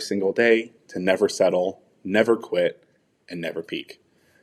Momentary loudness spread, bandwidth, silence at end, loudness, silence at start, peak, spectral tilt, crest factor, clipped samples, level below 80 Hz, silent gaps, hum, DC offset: 14 LU; 13 kHz; 0.5 s; -23 LUFS; 0 s; -4 dBFS; -4.5 dB/octave; 20 dB; under 0.1%; -74 dBFS; none; none; under 0.1%